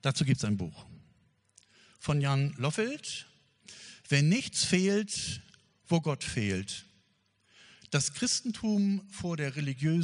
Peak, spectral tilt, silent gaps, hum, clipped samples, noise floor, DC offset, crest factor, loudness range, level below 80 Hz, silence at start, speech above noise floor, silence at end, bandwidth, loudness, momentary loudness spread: -10 dBFS; -4.5 dB/octave; none; none; under 0.1%; -71 dBFS; under 0.1%; 22 dB; 4 LU; -62 dBFS; 0.05 s; 42 dB; 0 s; 10.5 kHz; -31 LUFS; 14 LU